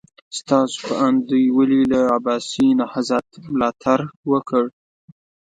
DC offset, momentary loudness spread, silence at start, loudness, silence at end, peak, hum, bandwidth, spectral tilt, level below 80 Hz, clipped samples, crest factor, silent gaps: under 0.1%; 7 LU; 0.3 s; -19 LUFS; 0.9 s; -2 dBFS; none; 9.2 kHz; -5.5 dB/octave; -58 dBFS; under 0.1%; 18 dB; 4.16-4.23 s